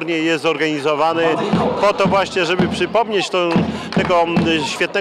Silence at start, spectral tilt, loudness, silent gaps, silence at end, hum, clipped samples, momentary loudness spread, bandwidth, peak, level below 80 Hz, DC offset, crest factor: 0 s; -5 dB/octave; -17 LUFS; none; 0 s; none; under 0.1%; 3 LU; 13 kHz; -6 dBFS; -48 dBFS; under 0.1%; 10 dB